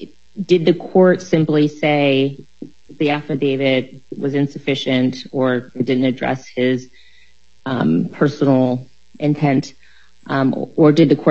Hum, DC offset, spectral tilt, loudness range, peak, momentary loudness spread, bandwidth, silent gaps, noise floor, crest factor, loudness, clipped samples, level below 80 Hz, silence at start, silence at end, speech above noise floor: none; 0.7%; -7 dB/octave; 3 LU; 0 dBFS; 10 LU; 7.6 kHz; none; -55 dBFS; 16 dB; -17 LUFS; under 0.1%; -58 dBFS; 0 s; 0 s; 39 dB